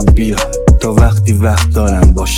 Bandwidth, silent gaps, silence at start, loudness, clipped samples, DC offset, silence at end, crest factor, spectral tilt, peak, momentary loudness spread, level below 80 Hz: 16 kHz; none; 0 s; -11 LUFS; 1%; under 0.1%; 0 s; 8 dB; -6 dB/octave; 0 dBFS; 3 LU; -12 dBFS